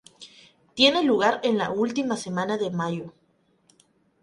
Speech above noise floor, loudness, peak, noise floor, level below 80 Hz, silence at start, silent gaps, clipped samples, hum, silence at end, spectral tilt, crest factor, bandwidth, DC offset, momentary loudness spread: 41 dB; -23 LUFS; -4 dBFS; -64 dBFS; -68 dBFS; 0.2 s; none; under 0.1%; none; 1.15 s; -4.5 dB/octave; 22 dB; 11.5 kHz; under 0.1%; 13 LU